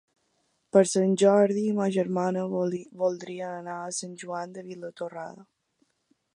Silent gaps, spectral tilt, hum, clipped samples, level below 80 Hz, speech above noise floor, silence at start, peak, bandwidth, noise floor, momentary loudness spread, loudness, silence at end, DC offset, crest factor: none; -5.5 dB/octave; none; under 0.1%; -78 dBFS; 46 dB; 0.75 s; -6 dBFS; 11.5 kHz; -73 dBFS; 16 LU; -26 LUFS; 0.95 s; under 0.1%; 22 dB